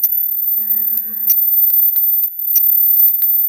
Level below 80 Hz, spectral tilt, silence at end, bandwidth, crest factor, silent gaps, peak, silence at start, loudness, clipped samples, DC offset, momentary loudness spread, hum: -80 dBFS; 0.5 dB/octave; 0 s; over 20 kHz; 12 dB; none; -2 dBFS; 0 s; -10 LUFS; under 0.1%; under 0.1%; 5 LU; none